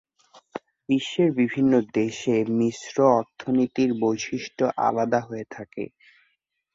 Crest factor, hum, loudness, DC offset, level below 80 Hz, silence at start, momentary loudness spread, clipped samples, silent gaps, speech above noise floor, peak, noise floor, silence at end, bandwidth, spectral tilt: 20 dB; none; -23 LUFS; under 0.1%; -64 dBFS; 0.35 s; 16 LU; under 0.1%; none; 49 dB; -4 dBFS; -72 dBFS; 0.9 s; 7.8 kHz; -6 dB/octave